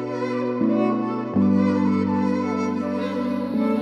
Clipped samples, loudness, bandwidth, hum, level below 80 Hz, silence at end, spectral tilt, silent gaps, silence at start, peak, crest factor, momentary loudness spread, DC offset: under 0.1%; -22 LUFS; 7.2 kHz; none; -68 dBFS; 0 s; -8.5 dB/octave; none; 0 s; -8 dBFS; 14 dB; 6 LU; under 0.1%